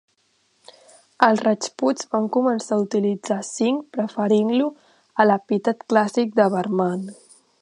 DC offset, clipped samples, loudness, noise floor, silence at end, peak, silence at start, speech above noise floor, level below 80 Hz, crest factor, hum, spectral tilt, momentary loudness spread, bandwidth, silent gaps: under 0.1%; under 0.1%; -21 LUFS; -65 dBFS; 0.5 s; 0 dBFS; 1.2 s; 45 dB; -74 dBFS; 22 dB; none; -5.5 dB/octave; 7 LU; 11 kHz; none